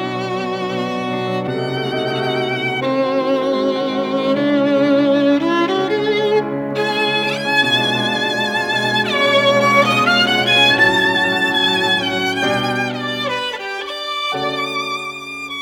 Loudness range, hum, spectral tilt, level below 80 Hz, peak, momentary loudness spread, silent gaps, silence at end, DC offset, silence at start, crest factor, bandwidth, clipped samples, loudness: 6 LU; none; -4.5 dB/octave; -56 dBFS; -2 dBFS; 9 LU; none; 0 s; under 0.1%; 0 s; 16 dB; 17.5 kHz; under 0.1%; -16 LUFS